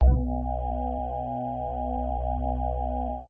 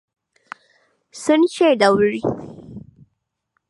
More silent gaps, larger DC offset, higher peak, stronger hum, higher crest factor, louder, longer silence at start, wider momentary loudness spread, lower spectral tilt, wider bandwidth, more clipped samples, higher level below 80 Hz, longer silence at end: neither; neither; second, -10 dBFS vs -2 dBFS; neither; about the same, 18 dB vs 20 dB; second, -30 LUFS vs -17 LUFS; second, 0 s vs 1.15 s; second, 3 LU vs 25 LU; first, -12.5 dB/octave vs -5 dB/octave; second, 3.4 kHz vs 11.5 kHz; neither; first, -28 dBFS vs -56 dBFS; second, 0 s vs 0.9 s